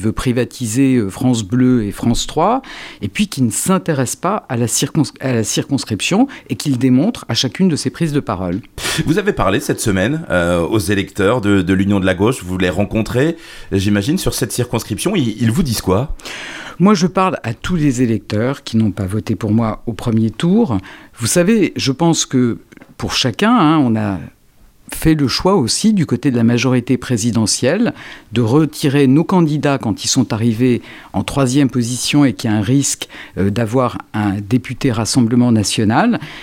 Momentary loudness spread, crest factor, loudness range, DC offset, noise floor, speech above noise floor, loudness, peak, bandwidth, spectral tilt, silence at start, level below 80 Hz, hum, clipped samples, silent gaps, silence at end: 7 LU; 14 dB; 2 LU; under 0.1%; -47 dBFS; 32 dB; -16 LUFS; 0 dBFS; 17 kHz; -5 dB/octave; 0 s; -38 dBFS; none; under 0.1%; none; 0 s